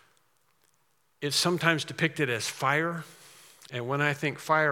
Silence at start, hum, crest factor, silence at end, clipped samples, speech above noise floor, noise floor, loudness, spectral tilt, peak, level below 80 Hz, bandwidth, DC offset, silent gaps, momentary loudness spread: 1.2 s; none; 24 dB; 0 s; under 0.1%; 44 dB; -72 dBFS; -28 LUFS; -4 dB/octave; -6 dBFS; -78 dBFS; 17.5 kHz; under 0.1%; none; 12 LU